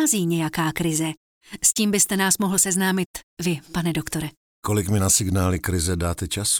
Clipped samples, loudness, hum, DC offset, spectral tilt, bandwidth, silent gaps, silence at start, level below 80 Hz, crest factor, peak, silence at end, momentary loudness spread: under 0.1%; -22 LUFS; none; under 0.1%; -3.5 dB/octave; over 20 kHz; 1.17-1.41 s, 3.06-3.14 s, 3.23-3.37 s, 4.37-4.63 s; 0 s; -46 dBFS; 18 dB; -4 dBFS; 0 s; 11 LU